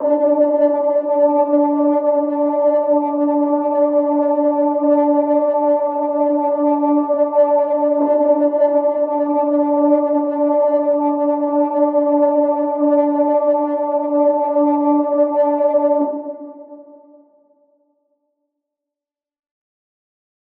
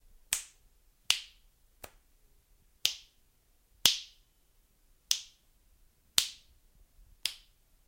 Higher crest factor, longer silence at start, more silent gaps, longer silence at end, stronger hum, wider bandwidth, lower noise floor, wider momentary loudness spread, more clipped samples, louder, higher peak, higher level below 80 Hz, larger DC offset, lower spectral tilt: second, 14 dB vs 34 dB; second, 0 s vs 0.3 s; neither; first, 3.65 s vs 0.5 s; neither; second, 3.1 kHz vs 16.5 kHz; first, -88 dBFS vs -68 dBFS; second, 3 LU vs 26 LU; neither; first, -16 LUFS vs -31 LUFS; about the same, -2 dBFS vs -4 dBFS; second, -74 dBFS vs -64 dBFS; neither; first, -9.5 dB/octave vs 2 dB/octave